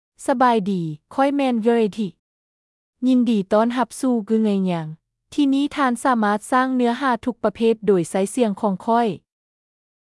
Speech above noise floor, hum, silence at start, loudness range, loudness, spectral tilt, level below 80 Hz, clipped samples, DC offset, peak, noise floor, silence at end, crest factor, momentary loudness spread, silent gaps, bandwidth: over 71 dB; none; 0.2 s; 2 LU; -20 LUFS; -6 dB/octave; -62 dBFS; under 0.1%; under 0.1%; -6 dBFS; under -90 dBFS; 0.85 s; 14 dB; 7 LU; 2.19-2.93 s; 12 kHz